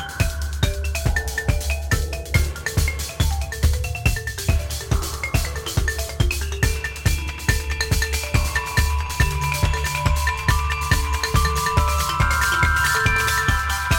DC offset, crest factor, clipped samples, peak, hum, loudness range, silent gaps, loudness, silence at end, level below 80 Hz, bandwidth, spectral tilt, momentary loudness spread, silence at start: under 0.1%; 18 dB; under 0.1%; -2 dBFS; none; 4 LU; none; -22 LUFS; 0 s; -24 dBFS; 17 kHz; -3.5 dB/octave; 6 LU; 0 s